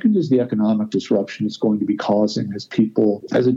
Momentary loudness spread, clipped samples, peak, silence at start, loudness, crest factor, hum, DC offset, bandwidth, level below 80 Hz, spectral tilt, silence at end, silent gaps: 4 LU; under 0.1%; -4 dBFS; 0 s; -20 LUFS; 14 dB; none; under 0.1%; 7.6 kHz; -62 dBFS; -7.5 dB/octave; 0 s; none